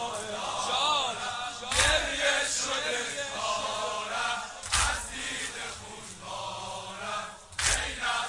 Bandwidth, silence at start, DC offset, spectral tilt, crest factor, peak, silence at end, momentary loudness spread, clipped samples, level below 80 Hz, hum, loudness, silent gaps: 11.5 kHz; 0 s; under 0.1%; -0.5 dB/octave; 22 dB; -10 dBFS; 0 s; 12 LU; under 0.1%; -46 dBFS; none; -29 LUFS; none